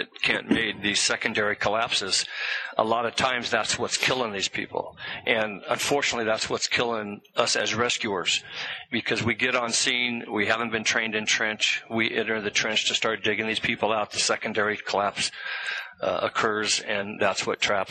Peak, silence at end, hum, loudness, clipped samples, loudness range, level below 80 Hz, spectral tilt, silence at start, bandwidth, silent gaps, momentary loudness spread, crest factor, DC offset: -4 dBFS; 0 s; none; -25 LUFS; under 0.1%; 2 LU; -62 dBFS; -2 dB/octave; 0 s; 10.5 kHz; none; 6 LU; 22 dB; under 0.1%